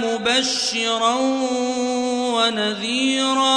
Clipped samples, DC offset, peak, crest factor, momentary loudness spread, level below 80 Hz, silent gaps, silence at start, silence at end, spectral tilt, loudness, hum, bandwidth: under 0.1%; under 0.1%; -6 dBFS; 14 dB; 4 LU; -62 dBFS; none; 0 s; 0 s; -2 dB/octave; -19 LUFS; none; 11 kHz